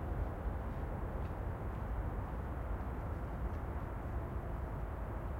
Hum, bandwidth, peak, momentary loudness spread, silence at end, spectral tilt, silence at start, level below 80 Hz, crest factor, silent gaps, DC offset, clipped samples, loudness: none; 16 kHz; -28 dBFS; 2 LU; 0 s; -9 dB/octave; 0 s; -42 dBFS; 12 dB; none; under 0.1%; under 0.1%; -42 LUFS